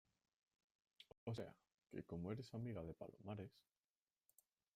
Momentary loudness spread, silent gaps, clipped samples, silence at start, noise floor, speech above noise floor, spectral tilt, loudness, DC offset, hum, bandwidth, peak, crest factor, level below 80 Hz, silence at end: 9 LU; 1.18-1.27 s, 1.74-1.78 s; under 0.1%; 1 s; under -90 dBFS; over 39 dB; -7.5 dB/octave; -53 LUFS; under 0.1%; none; 15 kHz; -36 dBFS; 20 dB; -78 dBFS; 1.15 s